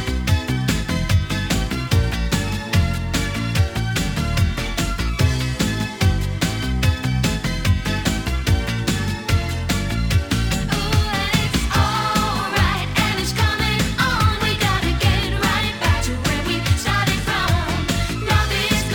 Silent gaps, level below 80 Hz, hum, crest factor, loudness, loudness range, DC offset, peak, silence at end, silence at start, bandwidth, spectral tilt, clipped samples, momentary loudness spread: none; -28 dBFS; none; 16 dB; -20 LUFS; 2 LU; under 0.1%; -4 dBFS; 0 s; 0 s; over 20 kHz; -4.5 dB/octave; under 0.1%; 4 LU